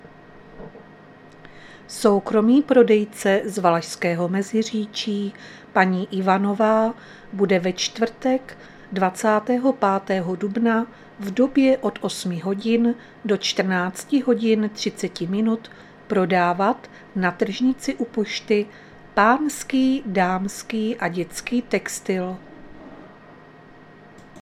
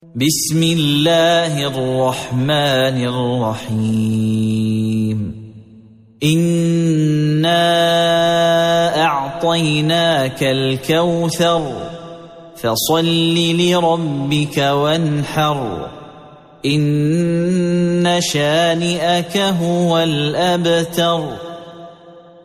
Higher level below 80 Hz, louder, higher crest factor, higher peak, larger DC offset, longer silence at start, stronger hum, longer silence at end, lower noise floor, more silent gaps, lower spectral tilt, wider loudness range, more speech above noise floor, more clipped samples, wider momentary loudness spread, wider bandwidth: second, -58 dBFS vs -50 dBFS; second, -22 LUFS vs -16 LUFS; first, 22 dB vs 12 dB; first, 0 dBFS vs -4 dBFS; neither; about the same, 0.05 s vs 0.15 s; neither; second, 0 s vs 0.25 s; about the same, -46 dBFS vs -43 dBFS; neither; about the same, -5 dB/octave vs -5 dB/octave; about the same, 3 LU vs 4 LU; about the same, 25 dB vs 28 dB; neither; first, 11 LU vs 7 LU; about the same, 15 kHz vs 15 kHz